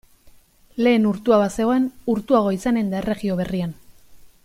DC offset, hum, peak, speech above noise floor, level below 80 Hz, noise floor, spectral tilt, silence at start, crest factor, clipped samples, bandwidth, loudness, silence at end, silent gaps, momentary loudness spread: under 0.1%; none; -6 dBFS; 31 dB; -50 dBFS; -50 dBFS; -7 dB/octave; 0.75 s; 16 dB; under 0.1%; 15.5 kHz; -21 LUFS; 0.15 s; none; 8 LU